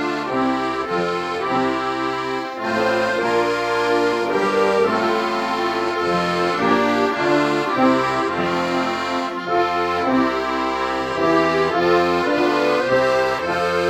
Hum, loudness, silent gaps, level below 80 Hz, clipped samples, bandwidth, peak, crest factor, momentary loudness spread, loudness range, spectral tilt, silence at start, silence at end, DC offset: none; -19 LUFS; none; -52 dBFS; under 0.1%; 15.5 kHz; -4 dBFS; 16 dB; 5 LU; 2 LU; -5 dB/octave; 0 s; 0 s; under 0.1%